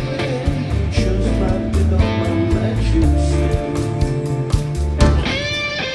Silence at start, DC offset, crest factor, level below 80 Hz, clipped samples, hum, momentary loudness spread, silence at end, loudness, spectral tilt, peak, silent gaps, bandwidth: 0 s; under 0.1%; 16 dB; -22 dBFS; under 0.1%; none; 5 LU; 0 s; -18 LUFS; -6.5 dB/octave; 0 dBFS; none; 12 kHz